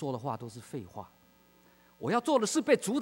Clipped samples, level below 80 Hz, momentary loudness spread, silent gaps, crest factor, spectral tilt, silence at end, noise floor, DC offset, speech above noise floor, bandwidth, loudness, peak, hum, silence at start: under 0.1%; -74 dBFS; 16 LU; none; 20 dB; -4.5 dB/octave; 0 s; -63 dBFS; under 0.1%; 32 dB; 16 kHz; -31 LUFS; -12 dBFS; none; 0 s